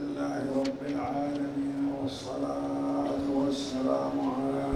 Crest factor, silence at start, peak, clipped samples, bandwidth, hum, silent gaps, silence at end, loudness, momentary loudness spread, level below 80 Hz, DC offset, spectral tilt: 14 dB; 0 s; -16 dBFS; under 0.1%; 11 kHz; none; none; 0 s; -31 LUFS; 4 LU; -58 dBFS; under 0.1%; -6 dB/octave